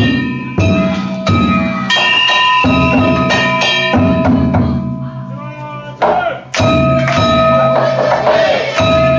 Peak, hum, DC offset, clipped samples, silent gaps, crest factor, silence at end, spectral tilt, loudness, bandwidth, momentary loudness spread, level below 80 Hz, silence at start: -2 dBFS; none; under 0.1%; under 0.1%; none; 10 dB; 0 s; -5.5 dB/octave; -11 LUFS; 7.8 kHz; 10 LU; -30 dBFS; 0 s